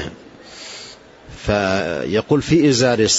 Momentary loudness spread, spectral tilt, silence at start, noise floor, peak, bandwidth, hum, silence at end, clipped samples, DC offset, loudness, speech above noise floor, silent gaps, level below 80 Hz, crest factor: 20 LU; -4.5 dB/octave; 0 s; -40 dBFS; -4 dBFS; 8 kHz; none; 0 s; under 0.1%; under 0.1%; -17 LUFS; 24 dB; none; -42 dBFS; 14 dB